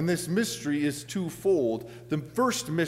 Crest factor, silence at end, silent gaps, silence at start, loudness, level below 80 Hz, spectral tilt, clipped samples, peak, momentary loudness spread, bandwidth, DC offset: 14 dB; 0 s; none; 0 s; -28 LUFS; -62 dBFS; -5 dB/octave; under 0.1%; -14 dBFS; 8 LU; 16 kHz; under 0.1%